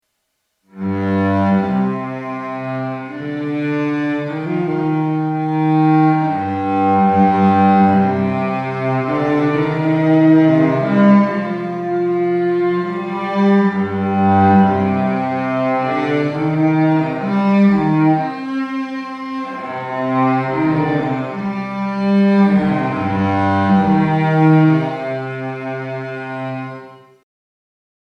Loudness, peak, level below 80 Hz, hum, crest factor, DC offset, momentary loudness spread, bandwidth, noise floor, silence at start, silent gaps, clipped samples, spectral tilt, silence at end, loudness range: -16 LUFS; 0 dBFS; -54 dBFS; none; 16 dB; under 0.1%; 13 LU; 6.4 kHz; -71 dBFS; 0.75 s; none; under 0.1%; -9 dB/octave; 1.1 s; 6 LU